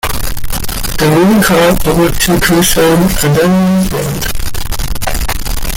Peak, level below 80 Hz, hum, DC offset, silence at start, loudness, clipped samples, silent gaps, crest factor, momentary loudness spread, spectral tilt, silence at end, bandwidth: 0 dBFS; -20 dBFS; none; under 0.1%; 0.05 s; -11 LUFS; under 0.1%; none; 10 dB; 11 LU; -4.5 dB/octave; 0 s; 17 kHz